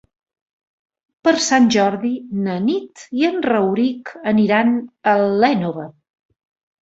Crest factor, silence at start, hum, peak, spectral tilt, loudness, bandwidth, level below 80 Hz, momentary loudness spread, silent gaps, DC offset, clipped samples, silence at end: 16 dB; 1.25 s; none; -2 dBFS; -5 dB/octave; -18 LUFS; 8 kHz; -62 dBFS; 11 LU; none; under 0.1%; under 0.1%; 0.95 s